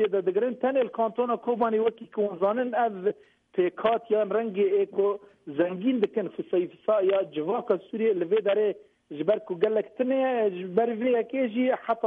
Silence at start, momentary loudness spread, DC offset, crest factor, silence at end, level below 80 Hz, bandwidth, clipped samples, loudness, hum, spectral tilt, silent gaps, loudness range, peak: 0 s; 5 LU; under 0.1%; 14 dB; 0 s; -74 dBFS; 4 kHz; under 0.1%; -27 LUFS; none; -9 dB/octave; none; 1 LU; -12 dBFS